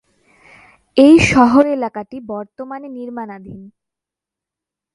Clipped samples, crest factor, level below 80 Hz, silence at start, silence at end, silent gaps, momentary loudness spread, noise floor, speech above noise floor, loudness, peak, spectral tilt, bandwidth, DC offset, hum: under 0.1%; 16 dB; -44 dBFS; 0.95 s; 1.25 s; none; 21 LU; -86 dBFS; 72 dB; -12 LUFS; 0 dBFS; -5.5 dB/octave; 11.5 kHz; under 0.1%; none